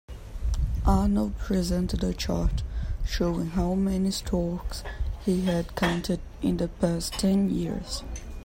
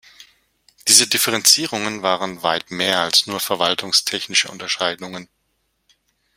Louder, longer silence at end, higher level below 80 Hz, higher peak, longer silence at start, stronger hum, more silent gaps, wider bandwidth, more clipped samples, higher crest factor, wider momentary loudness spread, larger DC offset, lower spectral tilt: second, -28 LUFS vs -17 LUFS; second, 0.05 s vs 1.15 s; first, -32 dBFS vs -64 dBFS; second, -10 dBFS vs 0 dBFS; about the same, 0.1 s vs 0.2 s; neither; neither; about the same, 16.5 kHz vs 16.5 kHz; neither; about the same, 16 dB vs 20 dB; about the same, 10 LU vs 11 LU; neither; first, -6 dB/octave vs -0.5 dB/octave